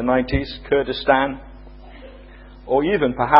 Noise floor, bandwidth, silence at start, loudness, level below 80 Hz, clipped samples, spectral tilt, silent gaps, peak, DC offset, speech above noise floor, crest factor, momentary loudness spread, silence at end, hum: -41 dBFS; 5.8 kHz; 0 s; -20 LUFS; -38 dBFS; under 0.1%; -8 dB/octave; none; 0 dBFS; under 0.1%; 23 dB; 20 dB; 23 LU; 0 s; none